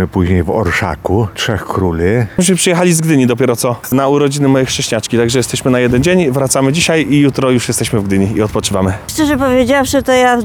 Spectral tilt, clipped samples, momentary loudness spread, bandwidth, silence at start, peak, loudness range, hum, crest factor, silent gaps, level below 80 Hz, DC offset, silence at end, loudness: -5 dB/octave; under 0.1%; 5 LU; over 20 kHz; 0 s; 0 dBFS; 1 LU; none; 12 dB; none; -34 dBFS; under 0.1%; 0 s; -12 LUFS